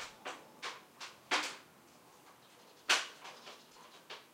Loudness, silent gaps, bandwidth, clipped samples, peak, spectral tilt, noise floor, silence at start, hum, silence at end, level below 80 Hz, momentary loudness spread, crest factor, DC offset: -37 LUFS; none; 16 kHz; under 0.1%; -16 dBFS; 0.5 dB/octave; -61 dBFS; 0 s; none; 0.05 s; -86 dBFS; 27 LU; 26 dB; under 0.1%